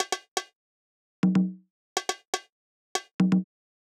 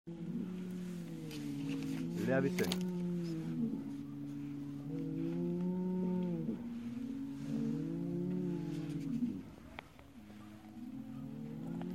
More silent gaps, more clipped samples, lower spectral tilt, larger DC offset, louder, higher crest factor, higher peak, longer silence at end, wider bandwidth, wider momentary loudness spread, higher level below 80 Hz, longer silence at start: first, 0.28-0.36 s, 0.55-1.23 s, 1.70-1.96 s, 2.27-2.33 s, 2.52-2.95 s, 3.13-3.19 s vs none; neither; second, -5 dB/octave vs -7 dB/octave; neither; first, -29 LUFS vs -40 LUFS; about the same, 20 dB vs 22 dB; first, -10 dBFS vs -18 dBFS; first, 0.5 s vs 0 s; second, 14.5 kHz vs 16 kHz; about the same, 12 LU vs 13 LU; second, -82 dBFS vs -68 dBFS; about the same, 0 s vs 0.05 s